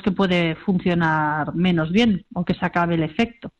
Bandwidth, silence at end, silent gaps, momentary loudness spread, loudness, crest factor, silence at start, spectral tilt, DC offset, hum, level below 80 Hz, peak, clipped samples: 7.6 kHz; 0.1 s; none; 5 LU; -21 LUFS; 14 dB; 0.05 s; -7.5 dB/octave; under 0.1%; none; -48 dBFS; -6 dBFS; under 0.1%